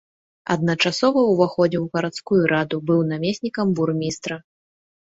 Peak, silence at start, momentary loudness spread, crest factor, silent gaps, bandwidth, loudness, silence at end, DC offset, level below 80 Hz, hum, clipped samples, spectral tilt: -4 dBFS; 0.5 s; 8 LU; 18 dB; none; 8 kHz; -21 LUFS; 0.65 s; under 0.1%; -60 dBFS; none; under 0.1%; -6 dB/octave